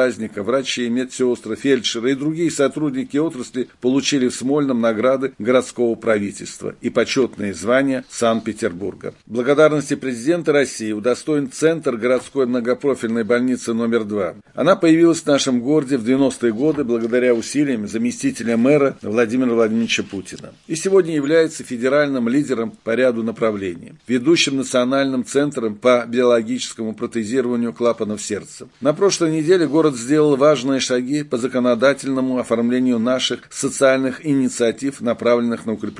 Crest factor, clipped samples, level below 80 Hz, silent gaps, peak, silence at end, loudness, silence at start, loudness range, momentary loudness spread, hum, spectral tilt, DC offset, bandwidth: 18 dB; under 0.1%; -62 dBFS; none; -2 dBFS; 0 s; -19 LUFS; 0 s; 3 LU; 8 LU; none; -4.5 dB/octave; under 0.1%; 11.5 kHz